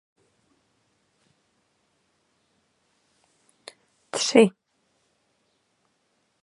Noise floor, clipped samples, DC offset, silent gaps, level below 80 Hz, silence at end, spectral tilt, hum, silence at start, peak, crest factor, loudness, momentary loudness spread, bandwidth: -71 dBFS; under 0.1%; under 0.1%; none; -80 dBFS; 1.95 s; -4 dB/octave; none; 4.15 s; -2 dBFS; 28 dB; -21 LUFS; 29 LU; 11.5 kHz